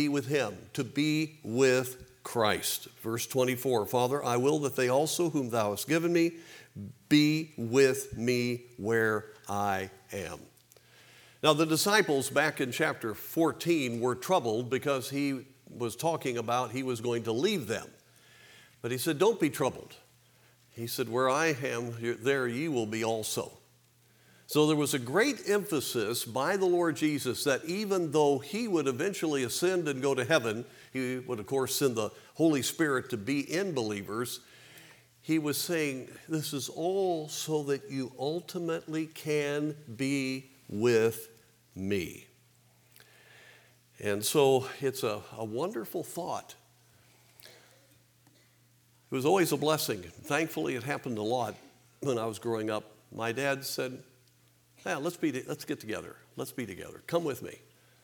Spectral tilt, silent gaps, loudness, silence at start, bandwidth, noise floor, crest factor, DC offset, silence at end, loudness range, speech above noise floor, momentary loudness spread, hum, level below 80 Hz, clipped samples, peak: -4.5 dB/octave; none; -30 LUFS; 0 s; over 20 kHz; -65 dBFS; 22 dB; under 0.1%; 0.45 s; 6 LU; 34 dB; 12 LU; none; -74 dBFS; under 0.1%; -8 dBFS